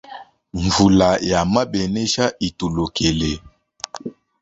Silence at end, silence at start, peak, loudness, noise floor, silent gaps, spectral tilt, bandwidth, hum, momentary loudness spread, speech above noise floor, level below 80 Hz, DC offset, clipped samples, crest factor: 0.3 s; 0.1 s; -2 dBFS; -18 LUFS; -40 dBFS; none; -5 dB/octave; 8 kHz; none; 19 LU; 22 dB; -38 dBFS; under 0.1%; under 0.1%; 18 dB